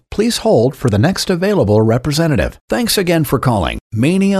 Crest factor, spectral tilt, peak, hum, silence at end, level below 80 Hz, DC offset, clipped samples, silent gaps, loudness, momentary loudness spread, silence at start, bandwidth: 14 dB; -5.5 dB/octave; 0 dBFS; none; 0 s; -34 dBFS; under 0.1%; under 0.1%; 2.61-2.68 s, 3.81-3.90 s; -14 LUFS; 5 LU; 0.1 s; 14 kHz